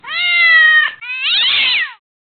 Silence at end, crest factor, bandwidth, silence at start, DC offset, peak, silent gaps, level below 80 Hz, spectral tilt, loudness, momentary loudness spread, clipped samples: 0.3 s; 12 dB; 4.7 kHz; 0.05 s; under 0.1%; -2 dBFS; none; -64 dBFS; -1.5 dB/octave; -10 LUFS; 11 LU; under 0.1%